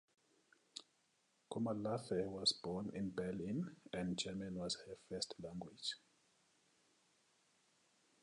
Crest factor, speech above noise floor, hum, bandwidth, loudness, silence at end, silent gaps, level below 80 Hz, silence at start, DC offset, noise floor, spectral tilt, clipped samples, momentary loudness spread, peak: 24 dB; 36 dB; none; 11 kHz; -43 LUFS; 2.25 s; none; -72 dBFS; 0.75 s; under 0.1%; -80 dBFS; -4.5 dB/octave; under 0.1%; 13 LU; -22 dBFS